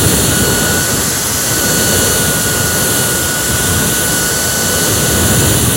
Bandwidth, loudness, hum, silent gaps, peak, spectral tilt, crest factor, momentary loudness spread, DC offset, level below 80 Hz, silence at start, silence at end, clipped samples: 16.5 kHz; -11 LUFS; none; none; 0 dBFS; -2.5 dB/octave; 12 dB; 2 LU; under 0.1%; -30 dBFS; 0 s; 0 s; under 0.1%